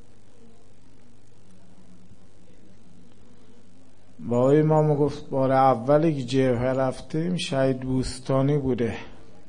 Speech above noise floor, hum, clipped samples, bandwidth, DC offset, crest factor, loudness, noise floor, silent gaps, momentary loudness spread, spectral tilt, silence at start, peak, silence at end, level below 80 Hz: 33 dB; none; under 0.1%; 10.5 kHz; 1%; 18 dB; -23 LUFS; -55 dBFS; none; 8 LU; -7 dB/octave; 4.2 s; -6 dBFS; 0.35 s; -50 dBFS